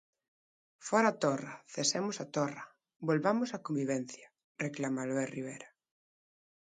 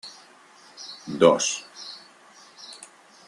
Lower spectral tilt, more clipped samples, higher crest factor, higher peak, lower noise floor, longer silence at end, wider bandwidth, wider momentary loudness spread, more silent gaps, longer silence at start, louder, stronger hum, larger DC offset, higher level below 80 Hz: about the same, -4 dB/octave vs -3 dB/octave; neither; about the same, 22 dB vs 26 dB; second, -14 dBFS vs -2 dBFS; first, under -90 dBFS vs -52 dBFS; first, 1 s vs 0.5 s; second, 9.6 kHz vs 11.5 kHz; second, 17 LU vs 25 LU; first, 4.44-4.55 s vs none; first, 0.8 s vs 0.05 s; second, -34 LUFS vs -22 LUFS; neither; neither; second, -82 dBFS vs -70 dBFS